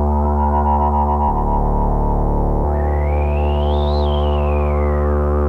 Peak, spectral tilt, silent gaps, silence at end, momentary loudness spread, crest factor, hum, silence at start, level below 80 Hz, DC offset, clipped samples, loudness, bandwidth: -6 dBFS; -9.5 dB/octave; none; 0 s; 3 LU; 10 dB; none; 0 s; -18 dBFS; under 0.1%; under 0.1%; -18 LUFS; 4.4 kHz